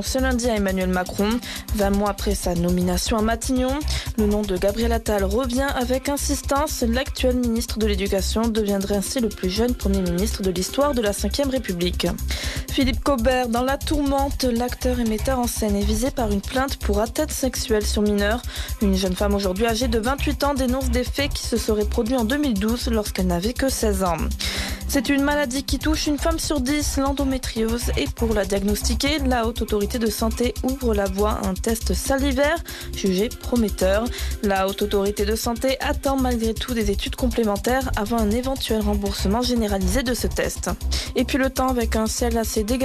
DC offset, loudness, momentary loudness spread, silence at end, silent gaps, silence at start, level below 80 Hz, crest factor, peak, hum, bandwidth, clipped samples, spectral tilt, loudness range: under 0.1%; -22 LUFS; 3 LU; 0 s; none; 0 s; -30 dBFS; 12 dB; -10 dBFS; none; 14 kHz; under 0.1%; -4.5 dB/octave; 1 LU